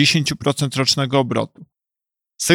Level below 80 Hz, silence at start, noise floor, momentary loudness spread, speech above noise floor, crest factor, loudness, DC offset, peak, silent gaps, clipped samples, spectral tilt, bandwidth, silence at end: -56 dBFS; 0 s; -87 dBFS; 8 LU; 68 dB; 18 dB; -19 LUFS; under 0.1%; -2 dBFS; none; under 0.1%; -4 dB/octave; 17.5 kHz; 0 s